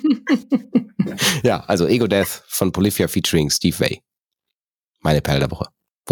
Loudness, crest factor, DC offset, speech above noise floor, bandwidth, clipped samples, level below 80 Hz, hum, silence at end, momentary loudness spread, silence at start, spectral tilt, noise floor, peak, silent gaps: -19 LUFS; 18 dB; under 0.1%; 65 dB; 19 kHz; under 0.1%; -42 dBFS; none; 0 s; 8 LU; 0 s; -4.5 dB/octave; -83 dBFS; -2 dBFS; 4.63-4.67 s, 4.74-4.82 s, 5.97-6.02 s